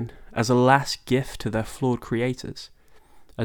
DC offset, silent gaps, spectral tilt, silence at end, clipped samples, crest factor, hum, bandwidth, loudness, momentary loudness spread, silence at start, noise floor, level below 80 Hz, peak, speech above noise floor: under 0.1%; none; -5.5 dB/octave; 0 s; under 0.1%; 22 dB; none; 19 kHz; -24 LUFS; 20 LU; 0 s; -49 dBFS; -48 dBFS; -2 dBFS; 26 dB